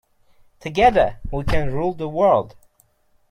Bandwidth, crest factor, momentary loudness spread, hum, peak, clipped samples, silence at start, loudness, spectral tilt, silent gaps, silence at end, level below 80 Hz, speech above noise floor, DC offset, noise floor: 12.5 kHz; 18 dB; 12 LU; none; -4 dBFS; under 0.1%; 0.65 s; -20 LUFS; -6.5 dB/octave; none; 0.8 s; -34 dBFS; 41 dB; under 0.1%; -60 dBFS